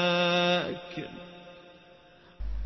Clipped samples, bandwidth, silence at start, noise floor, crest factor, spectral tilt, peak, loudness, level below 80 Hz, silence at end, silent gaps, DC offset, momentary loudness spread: under 0.1%; 6.2 kHz; 0 s; -56 dBFS; 16 dB; -5 dB/octave; -14 dBFS; -28 LUFS; -44 dBFS; 0 s; none; under 0.1%; 23 LU